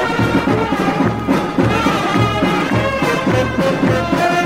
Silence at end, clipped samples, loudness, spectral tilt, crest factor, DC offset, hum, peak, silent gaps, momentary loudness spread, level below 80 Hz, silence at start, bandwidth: 0 s; under 0.1%; -16 LUFS; -6 dB/octave; 14 dB; under 0.1%; none; -2 dBFS; none; 2 LU; -36 dBFS; 0 s; 16 kHz